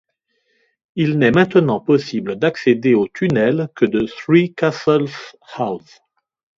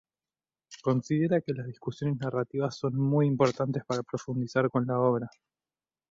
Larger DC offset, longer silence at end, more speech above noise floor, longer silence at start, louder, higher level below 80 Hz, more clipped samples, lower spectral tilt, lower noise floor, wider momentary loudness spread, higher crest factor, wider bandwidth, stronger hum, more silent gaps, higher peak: neither; about the same, 0.8 s vs 0.8 s; second, 51 dB vs over 62 dB; first, 0.95 s vs 0.7 s; first, -17 LUFS vs -29 LUFS; first, -54 dBFS vs -68 dBFS; neither; about the same, -7.5 dB/octave vs -7.5 dB/octave; second, -68 dBFS vs under -90 dBFS; first, 11 LU vs 8 LU; about the same, 18 dB vs 18 dB; about the same, 7.6 kHz vs 7.6 kHz; neither; neither; first, 0 dBFS vs -12 dBFS